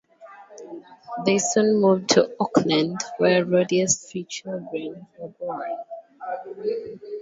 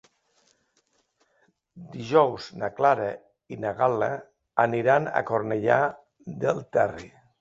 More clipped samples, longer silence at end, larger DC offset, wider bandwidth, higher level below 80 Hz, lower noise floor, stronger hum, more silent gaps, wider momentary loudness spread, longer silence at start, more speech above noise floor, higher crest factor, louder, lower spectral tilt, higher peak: neither; second, 0 s vs 0.35 s; neither; about the same, 8 kHz vs 7.8 kHz; about the same, -68 dBFS vs -64 dBFS; second, -47 dBFS vs -70 dBFS; neither; neither; about the same, 21 LU vs 19 LU; second, 0.2 s vs 1.75 s; second, 25 dB vs 45 dB; about the same, 22 dB vs 22 dB; about the same, -23 LUFS vs -25 LUFS; second, -4 dB/octave vs -6.5 dB/octave; first, -2 dBFS vs -6 dBFS